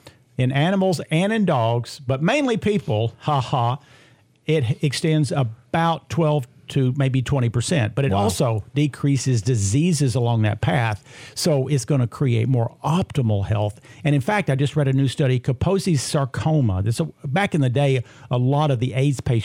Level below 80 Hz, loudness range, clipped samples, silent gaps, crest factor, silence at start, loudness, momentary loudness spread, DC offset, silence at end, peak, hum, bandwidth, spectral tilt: -50 dBFS; 2 LU; under 0.1%; none; 14 dB; 0.05 s; -21 LUFS; 5 LU; under 0.1%; 0 s; -6 dBFS; none; 15.5 kHz; -6 dB/octave